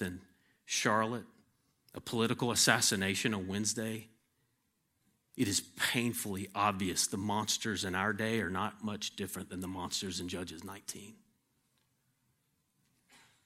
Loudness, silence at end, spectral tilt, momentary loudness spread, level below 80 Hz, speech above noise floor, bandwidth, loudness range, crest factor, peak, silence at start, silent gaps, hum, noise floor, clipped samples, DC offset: -33 LUFS; 2.3 s; -3 dB/octave; 15 LU; -70 dBFS; 44 dB; 16.5 kHz; 10 LU; 28 dB; -8 dBFS; 0 s; none; none; -79 dBFS; under 0.1%; under 0.1%